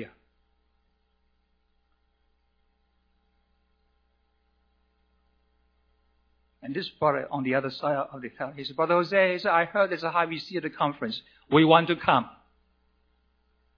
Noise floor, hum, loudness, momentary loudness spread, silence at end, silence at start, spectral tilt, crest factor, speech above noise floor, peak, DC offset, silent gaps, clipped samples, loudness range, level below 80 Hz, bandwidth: -71 dBFS; none; -25 LUFS; 15 LU; 1.45 s; 0 s; -7.5 dB/octave; 26 dB; 45 dB; -4 dBFS; under 0.1%; none; under 0.1%; 10 LU; -68 dBFS; 5.4 kHz